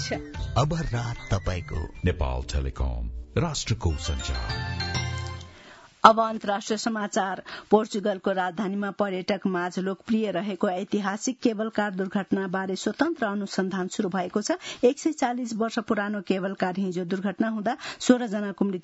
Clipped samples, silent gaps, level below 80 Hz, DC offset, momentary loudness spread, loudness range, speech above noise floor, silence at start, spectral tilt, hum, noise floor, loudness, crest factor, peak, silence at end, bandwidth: under 0.1%; none; -40 dBFS; under 0.1%; 7 LU; 5 LU; 24 dB; 0 s; -5.5 dB/octave; none; -50 dBFS; -27 LUFS; 26 dB; 0 dBFS; 0 s; 8 kHz